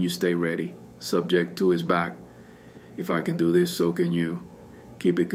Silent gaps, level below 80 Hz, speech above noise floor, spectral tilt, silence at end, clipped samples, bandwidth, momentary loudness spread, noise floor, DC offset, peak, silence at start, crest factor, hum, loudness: none; -62 dBFS; 23 dB; -6 dB/octave; 0 s; under 0.1%; 16 kHz; 14 LU; -47 dBFS; under 0.1%; -8 dBFS; 0 s; 18 dB; none; -25 LUFS